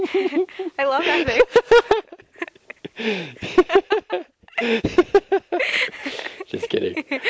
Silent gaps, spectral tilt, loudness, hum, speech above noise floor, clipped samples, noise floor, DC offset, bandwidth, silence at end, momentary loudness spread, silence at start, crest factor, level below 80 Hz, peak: none; -4.5 dB/octave; -20 LUFS; none; 22 dB; under 0.1%; -40 dBFS; under 0.1%; 8 kHz; 0 s; 15 LU; 0 s; 18 dB; -48 dBFS; -2 dBFS